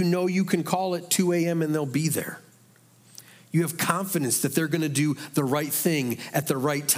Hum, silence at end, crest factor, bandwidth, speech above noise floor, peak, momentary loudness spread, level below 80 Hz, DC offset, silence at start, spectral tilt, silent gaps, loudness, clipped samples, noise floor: none; 0 s; 20 dB; 16.5 kHz; 32 dB; -6 dBFS; 4 LU; -74 dBFS; under 0.1%; 0 s; -4.5 dB/octave; none; -25 LUFS; under 0.1%; -57 dBFS